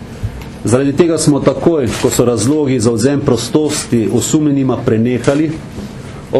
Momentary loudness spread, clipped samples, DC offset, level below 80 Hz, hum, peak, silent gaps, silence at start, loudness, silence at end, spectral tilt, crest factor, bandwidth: 14 LU; under 0.1%; under 0.1%; -36 dBFS; none; 0 dBFS; none; 0 s; -13 LUFS; 0 s; -5.5 dB/octave; 14 dB; 13 kHz